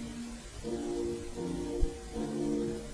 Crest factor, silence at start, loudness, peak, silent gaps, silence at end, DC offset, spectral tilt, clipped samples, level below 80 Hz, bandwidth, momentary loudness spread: 20 dB; 0 s; -37 LUFS; -14 dBFS; none; 0 s; under 0.1%; -6 dB/octave; under 0.1%; -42 dBFS; 11 kHz; 9 LU